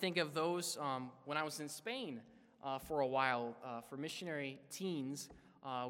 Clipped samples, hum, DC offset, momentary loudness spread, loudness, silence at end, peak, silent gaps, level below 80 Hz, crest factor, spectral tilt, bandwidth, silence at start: under 0.1%; none; under 0.1%; 12 LU; -41 LUFS; 0 s; -18 dBFS; none; -76 dBFS; 24 dB; -4 dB/octave; 16.5 kHz; 0 s